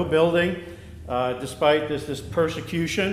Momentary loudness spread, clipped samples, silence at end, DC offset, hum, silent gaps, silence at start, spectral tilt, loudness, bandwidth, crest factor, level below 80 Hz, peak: 11 LU; under 0.1%; 0 s; under 0.1%; none; none; 0 s; -5.5 dB/octave; -24 LUFS; 15.5 kHz; 18 dB; -46 dBFS; -6 dBFS